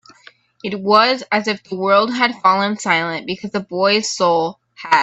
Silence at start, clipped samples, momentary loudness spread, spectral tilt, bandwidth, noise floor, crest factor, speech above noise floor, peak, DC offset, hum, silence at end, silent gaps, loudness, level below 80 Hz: 0.65 s; under 0.1%; 11 LU; -3.5 dB/octave; 8.4 kHz; -48 dBFS; 18 dB; 31 dB; 0 dBFS; under 0.1%; none; 0 s; none; -17 LUFS; -64 dBFS